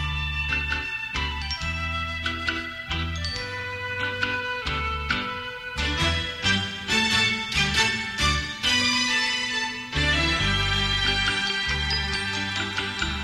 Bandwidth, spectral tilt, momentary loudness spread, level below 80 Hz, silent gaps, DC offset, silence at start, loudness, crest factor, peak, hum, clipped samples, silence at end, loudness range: 15.5 kHz; -3 dB/octave; 8 LU; -36 dBFS; none; under 0.1%; 0 s; -24 LUFS; 18 dB; -8 dBFS; none; under 0.1%; 0 s; 6 LU